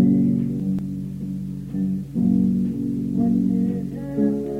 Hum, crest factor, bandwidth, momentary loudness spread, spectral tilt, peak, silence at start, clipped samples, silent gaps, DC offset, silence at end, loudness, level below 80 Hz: none; 14 dB; 3.2 kHz; 10 LU; -10.5 dB/octave; -6 dBFS; 0 s; under 0.1%; none; under 0.1%; 0 s; -23 LUFS; -46 dBFS